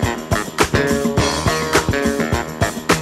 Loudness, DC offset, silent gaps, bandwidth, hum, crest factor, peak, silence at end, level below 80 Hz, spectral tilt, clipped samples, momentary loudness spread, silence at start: -18 LUFS; under 0.1%; none; 16 kHz; none; 18 dB; 0 dBFS; 0 s; -32 dBFS; -4.5 dB/octave; under 0.1%; 5 LU; 0 s